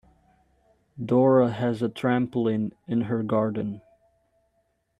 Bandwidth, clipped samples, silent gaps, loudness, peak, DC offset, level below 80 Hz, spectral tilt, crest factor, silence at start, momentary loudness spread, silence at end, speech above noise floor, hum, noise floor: 10 kHz; under 0.1%; none; -25 LUFS; -8 dBFS; under 0.1%; -64 dBFS; -9 dB/octave; 18 dB; 0.95 s; 12 LU; 1.2 s; 48 dB; none; -72 dBFS